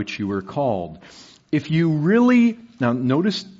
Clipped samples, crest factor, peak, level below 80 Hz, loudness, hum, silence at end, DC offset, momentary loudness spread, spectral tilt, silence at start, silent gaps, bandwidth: under 0.1%; 14 dB; -6 dBFS; -62 dBFS; -20 LUFS; none; 0.15 s; under 0.1%; 10 LU; -6 dB/octave; 0 s; none; 7.6 kHz